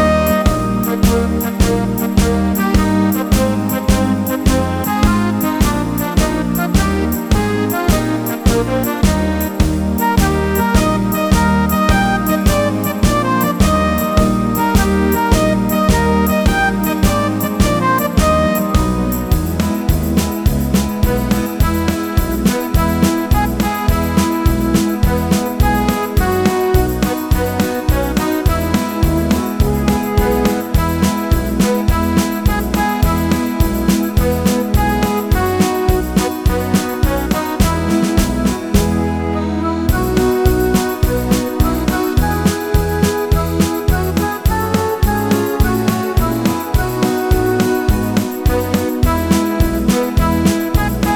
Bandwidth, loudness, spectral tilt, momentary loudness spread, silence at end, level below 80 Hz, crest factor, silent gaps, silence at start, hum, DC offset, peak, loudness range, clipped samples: over 20 kHz; -15 LUFS; -6 dB/octave; 3 LU; 0 s; -20 dBFS; 14 dB; none; 0 s; none; under 0.1%; -2 dBFS; 2 LU; under 0.1%